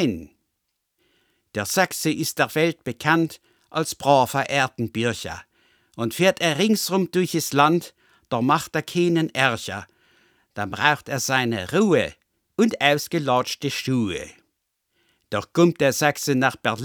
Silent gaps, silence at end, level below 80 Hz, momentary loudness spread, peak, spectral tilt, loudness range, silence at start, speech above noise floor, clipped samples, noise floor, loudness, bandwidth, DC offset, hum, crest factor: none; 0 s; -60 dBFS; 12 LU; 0 dBFS; -4.5 dB/octave; 3 LU; 0 s; 55 dB; under 0.1%; -77 dBFS; -22 LUFS; over 20 kHz; under 0.1%; none; 22 dB